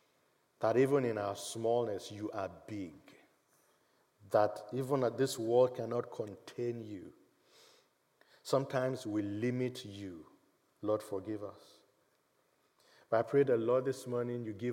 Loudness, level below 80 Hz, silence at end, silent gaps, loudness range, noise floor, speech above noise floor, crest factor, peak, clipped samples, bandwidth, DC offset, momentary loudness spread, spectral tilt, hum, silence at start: -35 LUFS; -86 dBFS; 0 s; none; 6 LU; -75 dBFS; 40 dB; 20 dB; -16 dBFS; under 0.1%; 16.5 kHz; under 0.1%; 15 LU; -6 dB/octave; none; 0.6 s